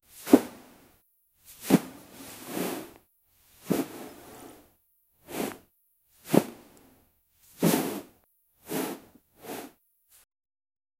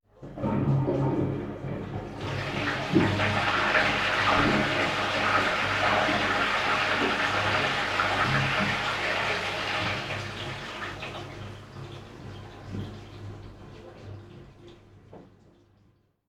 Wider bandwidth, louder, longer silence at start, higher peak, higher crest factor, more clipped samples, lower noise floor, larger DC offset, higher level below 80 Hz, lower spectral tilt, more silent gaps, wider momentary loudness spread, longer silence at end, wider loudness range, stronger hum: first, 16 kHz vs 14.5 kHz; second, -29 LUFS vs -26 LUFS; about the same, 0.15 s vs 0.2 s; first, -2 dBFS vs -10 dBFS; first, 30 dB vs 20 dB; neither; first, -69 dBFS vs -64 dBFS; neither; second, -68 dBFS vs -50 dBFS; about the same, -5.5 dB/octave vs -5 dB/octave; neither; first, 25 LU vs 20 LU; first, 1.3 s vs 1 s; second, 7 LU vs 19 LU; neither